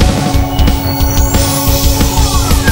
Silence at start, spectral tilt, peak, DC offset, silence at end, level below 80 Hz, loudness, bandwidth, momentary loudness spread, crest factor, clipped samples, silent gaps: 0 s; -4.5 dB/octave; 0 dBFS; 0.9%; 0 s; -14 dBFS; -11 LUFS; 16.5 kHz; 2 LU; 10 dB; 0.1%; none